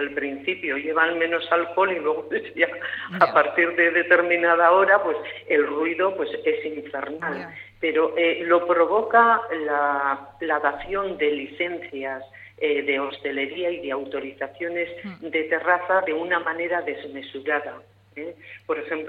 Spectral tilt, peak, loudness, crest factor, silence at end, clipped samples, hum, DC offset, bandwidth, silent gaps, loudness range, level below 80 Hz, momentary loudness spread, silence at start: -6.5 dB/octave; -4 dBFS; -23 LUFS; 20 dB; 0 s; under 0.1%; none; under 0.1%; 5 kHz; none; 7 LU; -62 dBFS; 14 LU; 0 s